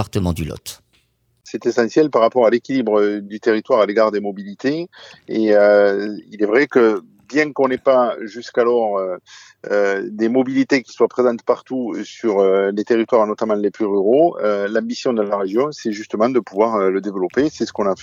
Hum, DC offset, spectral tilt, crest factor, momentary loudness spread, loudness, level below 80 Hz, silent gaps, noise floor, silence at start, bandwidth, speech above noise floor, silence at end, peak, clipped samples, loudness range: none; under 0.1%; -6 dB/octave; 16 dB; 10 LU; -18 LUFS; -50 dBFS; none; -62 dBFS; 0 s; 15 kHz; 45 dB; 0 s; -2 dBFS; under 0.1%; 2 LU